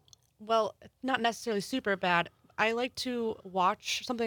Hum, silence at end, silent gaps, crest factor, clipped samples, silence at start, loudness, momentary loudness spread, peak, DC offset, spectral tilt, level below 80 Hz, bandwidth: none; 0 s; none; 20 dB; under 0.1%; 0.4 s; -31 LUFS; 7 LU; -12 dBFS; under 0.1%; -3.5 dB/octave; -70 dBFS; 19 kHz